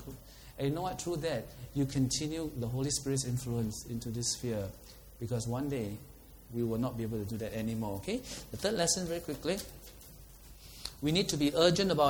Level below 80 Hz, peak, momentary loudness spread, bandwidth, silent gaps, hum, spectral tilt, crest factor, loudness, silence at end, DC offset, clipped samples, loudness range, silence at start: -54 dBFS; -10 dBFS; 21 LU; over 20 kHz; none; none; -4.5 dB/octave; 24 dB; -34 LUFS; 0 s; under 0.1%; under 0.1%; 3 LU; 0 s